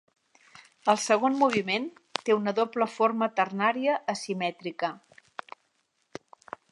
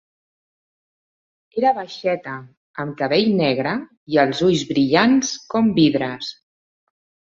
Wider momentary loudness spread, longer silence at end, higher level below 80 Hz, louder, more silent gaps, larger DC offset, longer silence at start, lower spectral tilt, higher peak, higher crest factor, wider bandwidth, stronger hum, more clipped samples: first, 22 LU vs 14 LU; first, 1.75 s vs 1.05 s; second, -78 dBFS vs -58 dBFS; second, -27 LUFS vs -19 LUFS; second, none vs 2.57-2.74 s, 3.97-4.06 s; neither; second, 0.85 s vs 1.55 s; about the same, -4 dB/octave vs -5 dB/octave; second, -8 dBFS vs -2 dBFS; about the same, 22 dB vs 18 dB; first, 11.5 kHz vs 7.8 kHz; neither; neither